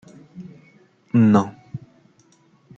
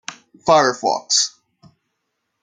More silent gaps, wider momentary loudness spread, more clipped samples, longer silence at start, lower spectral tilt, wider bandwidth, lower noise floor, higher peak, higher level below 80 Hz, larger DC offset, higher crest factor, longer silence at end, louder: neither; first, 25 LU vs 11 LU; neither; first, 0.35 s vs 0.1 s; first, -8.5 dB/octave vs -1.5 dB/octave; second, 7.6 kHz vs 10 kHz; second, -57 dBFS vs -75 dBFS; about the same, -2 dBFS vs -2 dBFS; about the same, -64 dBFS vs -62 dBFS; neither; about the same, 20 dB vs 20 dB; second, 1 s vs 1.15 s; about the same, -18 LUFS vs -17 LUFS